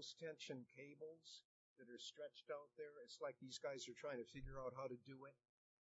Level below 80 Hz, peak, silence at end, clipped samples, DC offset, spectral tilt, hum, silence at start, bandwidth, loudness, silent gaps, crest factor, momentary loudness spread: -72 dBFS; -38 dBFS; 0.45 s; under 0.1%; under 0.1%; -3 dB/octave; none; 0 s; 7.6 kHz; -55 LUFS; 1.45-1.76 s; 18 dB; 11 LU